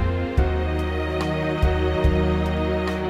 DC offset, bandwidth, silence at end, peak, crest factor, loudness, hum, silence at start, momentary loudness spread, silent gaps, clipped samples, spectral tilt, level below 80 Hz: under 0.1%; 10.5 kHz; 0 s; -6 dBFS; 16 dB; -23 LUFS; none; 0 s; 4 LU; none; under 0.1%; -7.5 dB/octave; -26 dBFS